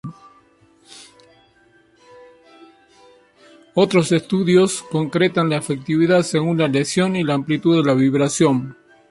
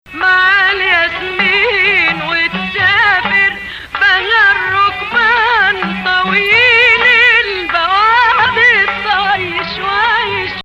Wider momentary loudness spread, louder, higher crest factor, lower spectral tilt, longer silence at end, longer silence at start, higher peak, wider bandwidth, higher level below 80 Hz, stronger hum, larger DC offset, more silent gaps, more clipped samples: about the same, 7 LU vs 8 LU; second, -18 LUFS vs -10 LUFS; about the same, 16 dB vs 12 dB; first, -5.5 dB/octave vs -3.5 dB/octave; first, 0.4 s vs 0.05 s; about the same, 0.05 s vs 0.1 s; second, -4 dBFS vs 0 dBFS; second, 11.5 kHz vs 14.5 kHz; second, -60 dBFS vs -42 dBFS; neither; neither; neither; neither